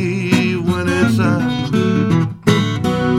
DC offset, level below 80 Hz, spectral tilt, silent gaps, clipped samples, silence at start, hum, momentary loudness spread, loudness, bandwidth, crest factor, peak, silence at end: under 0.1%; -44 dBFS; -6.5 dB/octave; none; under 0.1%; 0 s; none; 3 LU; -16 LUFS; 15.5 kHz; 14 dB; 0 dBFS; 0 s